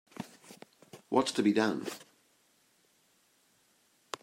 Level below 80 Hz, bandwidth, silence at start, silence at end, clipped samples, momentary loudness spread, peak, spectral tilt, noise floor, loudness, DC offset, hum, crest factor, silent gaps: -80 dBFS; 16 kHz; 0.2 s; 2.2 s; under 0.1%; 26 LU; -12 dBFS; -4.5 dB/octave; -70 dBFS; -31 LUFS; under 0.1%; none; 24 dB; none